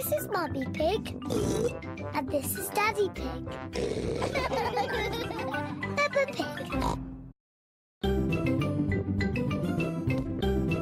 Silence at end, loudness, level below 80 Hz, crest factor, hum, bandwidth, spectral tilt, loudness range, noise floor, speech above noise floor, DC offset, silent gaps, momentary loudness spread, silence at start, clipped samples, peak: 0 s; -30 LUFS; -44 dBFS; 14 dB; none; 16 kHz; -5.5 dB/octave; 1 LU; under -90 dBFS; over 59 dB; under 0.1%; 7.40-8.01 s; 7 LU; 0 s; under 0.1%; -16 dBFS